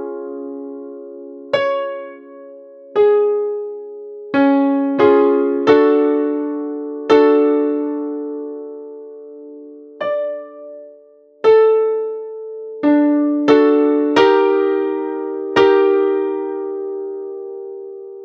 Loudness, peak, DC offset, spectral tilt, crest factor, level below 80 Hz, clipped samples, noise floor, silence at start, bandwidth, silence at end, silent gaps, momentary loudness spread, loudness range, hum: -16 LUFS; 0 dBFS; under 0.1%; -6 dB/octave; 16 dB; -66 dBFS; under 0.1%; -47 dBFS; 0 s; 6.6 kHz; 0 s; none; 21 LU; 7 LU; none